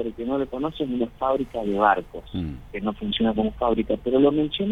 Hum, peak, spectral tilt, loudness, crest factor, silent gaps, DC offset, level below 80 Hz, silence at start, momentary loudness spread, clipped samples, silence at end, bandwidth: none; -6 dBFS; -8 dB/octave; -24 LUFS; 18 dB; none; under 0.1%; -44 dBFS; 0 s; 11 LU; under 0.1%; 0 s; 6.4 kHz